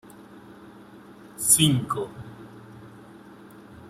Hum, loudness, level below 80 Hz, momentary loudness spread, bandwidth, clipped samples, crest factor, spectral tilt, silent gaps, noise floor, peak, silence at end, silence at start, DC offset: none; -21 LUFS; -60 dBFS; 28 LU; 15.5 kHz; under 0.1%; 24 dB; -3 dB/octave; none; -47 dBFS; -4 dBFS; 0 s; 0.35 s; under 0.1%